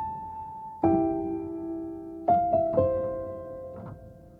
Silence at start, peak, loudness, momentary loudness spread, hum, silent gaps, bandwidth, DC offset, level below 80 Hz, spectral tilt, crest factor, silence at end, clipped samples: 0 s; -10 dBFS; -28 LUFS; 16 LU; none; none; 3.8 kHz; under 0.1%; -54 dBFS; -11 dB/octave; 18 dB; 0 s; under 0.1%